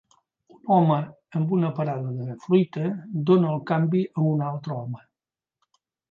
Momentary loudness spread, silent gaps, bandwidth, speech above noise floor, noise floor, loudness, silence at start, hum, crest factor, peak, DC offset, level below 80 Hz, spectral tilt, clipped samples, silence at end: 12 LU; none; 6.4 kHz; over 67 dB; under -90 dBFS; -24 LUFS; 0.65 s; none; 18 dB; -8 dBFS; under 0.1%; -72 dBFS; -10 dB/octave; under 0.1%; 1.15 s